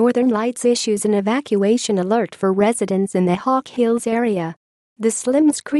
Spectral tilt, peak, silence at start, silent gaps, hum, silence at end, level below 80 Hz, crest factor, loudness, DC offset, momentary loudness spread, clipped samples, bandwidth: -5 dB/octave; -6 dBFS; 0 s; 4.56-4.96 s; none; 0 s; -64 dBFS; 12 dB; -18 LUFS; under 0.1%; 4 LU; under 0.1%; 12.5 kHz